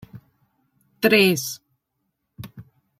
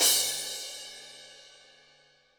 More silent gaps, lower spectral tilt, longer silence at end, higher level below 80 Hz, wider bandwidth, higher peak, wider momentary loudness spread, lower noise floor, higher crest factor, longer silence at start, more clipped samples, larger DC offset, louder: neither; first, -4 dB/octave vs 2.5 dB/octave; second, 0.4 s vs 0.9 s; first, -64 dBFS vs -72 dBFS; second, 16 kHz vs over 20 kHz; first, -4 dBFS vs -10 dBFS; about the same, 25 LU vs 26 LU; first, -76 dBFS vs -63 dBFS; about the same, 22 dB vs 22 dB; first, 0.15 s vs 0 s; neither; neither; first, -19 LUFS vs -28 LUFS